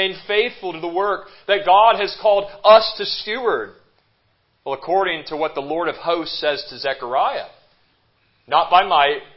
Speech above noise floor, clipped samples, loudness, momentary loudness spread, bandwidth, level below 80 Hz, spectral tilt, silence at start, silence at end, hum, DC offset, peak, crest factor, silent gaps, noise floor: 45 dB; under 0.1%; -18 LUFS; 13 LU; 5.8 kHz; -58 dBFS; -7 dB/octave; 0 s; 0.15 s; none; under 0.1%; 0 dBFS; 18 dB; none; -64 dBFS